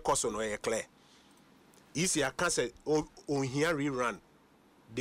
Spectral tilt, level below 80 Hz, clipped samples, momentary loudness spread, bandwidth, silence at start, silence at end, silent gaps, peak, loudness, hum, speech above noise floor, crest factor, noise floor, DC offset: -3.5 dB/octave; -60 dBFS; under 0.1%; 9 LU; 16 kHz; 0 s; 0 s; none; -18 dBFS; -32 LUFS; none; 31 dB; 16 dB; -63 dBFS; under 0.1%